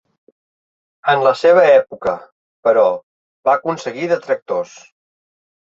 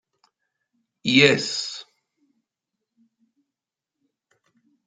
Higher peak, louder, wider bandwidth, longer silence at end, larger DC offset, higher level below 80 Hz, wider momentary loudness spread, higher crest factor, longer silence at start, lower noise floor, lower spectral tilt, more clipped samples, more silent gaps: about the same, -2 dBFS vs 0 dBFS; first, -16 LUFS vs -19 LUFS; second, 7.6 kHz vs 9.6 kHz; second, 1 s vs 3.05 s; neither; first, -62 dBFS vs -68 dBFS; second, 12 LU vs 17 LU; second, 16 dB vs 28 dB; about the same, 1.05 s vs 1.05 s; about the same, under -90 dBFS vs -87 dBFS; first, -5 dB/octave vs -3.5 dB/octave; neither; first, 2.32-2.63 s, 3.03-3.43 s, 4.42-4.46 s vs none